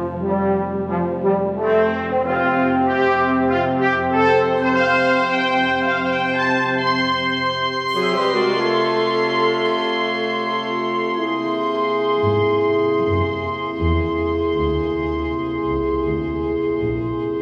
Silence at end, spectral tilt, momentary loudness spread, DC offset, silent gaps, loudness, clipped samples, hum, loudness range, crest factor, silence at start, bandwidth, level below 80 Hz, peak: 0 s; -6.5 dB/octave; 5 LU; under 0.1%; none; -19 LUFS; under 0.1%; none; 4 LU; 14 dB; 0 s; 8.2 kHz; -38 dBFS; -4 dBFS